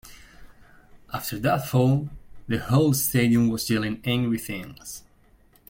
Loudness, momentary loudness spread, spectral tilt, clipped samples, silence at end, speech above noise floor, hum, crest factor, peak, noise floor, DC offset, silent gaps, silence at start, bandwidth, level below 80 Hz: -24 LUFS; 17 LU; -5.5 dB/octave; under 0.1%; 0.7 s; 34 dB; none; 18 dB; -8 dBFS; -57 dBFS; under 0.1%; none; 0.05 s; 17 kHz; -50 dBFS